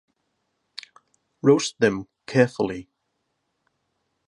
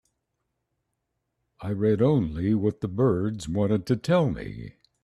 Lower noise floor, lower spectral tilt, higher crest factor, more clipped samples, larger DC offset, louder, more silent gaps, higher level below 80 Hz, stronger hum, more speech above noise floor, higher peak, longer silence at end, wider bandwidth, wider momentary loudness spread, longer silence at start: about the same, -76 dBFS vs -79 dBFS; second, -5.5 dB/octave vs -8 dB/octave; first, 22 dB vs 16 dB; neither; neither; first, -22 LUFS vs -25 LUFS; neither; second, -62 dBFS vs -50 dBFS; neither; about the same, 55 dB vs 55 dB; first, -4 dBFS vs -10 dBFS; first, 1.45 s vs 0.35 s; second, 11 kHz vs 12.5 kHz; first, 21 LU vs 15 LU; second, 1.45 s vs 1.6 s